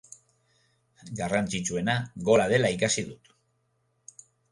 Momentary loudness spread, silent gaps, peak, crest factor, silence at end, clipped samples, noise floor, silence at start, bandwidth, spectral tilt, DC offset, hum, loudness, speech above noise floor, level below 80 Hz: 12 LU; none; -8 dBFS; 20 dB; 1.35 s; under 0.1%; -73 dBFS; 1.05 s; 11.5 kHz; -4 dB/octave; under 0.1%; none; -26 LUFS; 46 dB; -58 dBFS